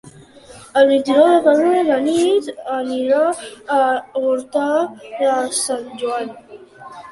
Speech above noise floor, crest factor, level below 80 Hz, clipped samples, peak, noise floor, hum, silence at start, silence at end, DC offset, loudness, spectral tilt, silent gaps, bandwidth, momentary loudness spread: 26 dB; 16 dB; -62 dBFS; under 0.1%; -2 dBFS; -42 dBFS; none; 0.05 s; 0 s; under 0.1%; -17 LUFS; -3 dB/octave; none; 11.5 kHz; 11 LU